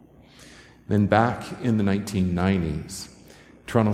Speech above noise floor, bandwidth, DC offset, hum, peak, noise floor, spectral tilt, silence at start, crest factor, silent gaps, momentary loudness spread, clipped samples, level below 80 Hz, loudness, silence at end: 27 dB; 15 kHz; under 0.1%; none; -2 dBFS; -50 dBFS; -7 dB/octave; 0.4 s; 22 dB; none; 16 LU; under 0.1%; -46 dBFS; -24 LUFS; 0 s